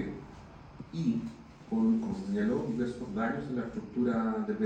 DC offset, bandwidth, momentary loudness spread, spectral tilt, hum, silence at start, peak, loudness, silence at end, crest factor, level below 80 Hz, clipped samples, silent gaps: under 0.1%; 8.6 kHz; 19 LU; -8 dB/octave; none; 0 s; -18 dBFS; -33 LUFS; 0 s; 14 dB; -58 dBFS; under 0.1%; none